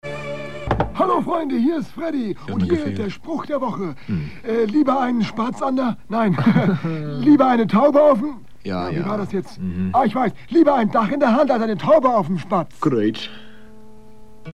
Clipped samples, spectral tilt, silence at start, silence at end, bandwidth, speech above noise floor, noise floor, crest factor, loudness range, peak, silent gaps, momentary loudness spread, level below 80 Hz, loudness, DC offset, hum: under 0.1%; -8 dB/octave; 0 s; 0 s; 11.5 kHz; 26 dB; -45 dBFS; 16 dB; 5 LU; -2 dBFS; none; 12 LU; -46 dBFS; -19 LUFS; 1%; none